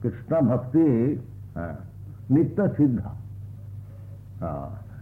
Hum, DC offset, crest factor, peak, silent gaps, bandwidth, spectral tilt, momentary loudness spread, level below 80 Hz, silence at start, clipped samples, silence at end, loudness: 50 Hz at -40 dBFS; under 0.1%; 16 dB; -10 dBFS; none; 3 kHz; -12 dB/octave; 20 LU; -50 dBFS; 0 s; under 0.1%; 0 s; -24 LUFS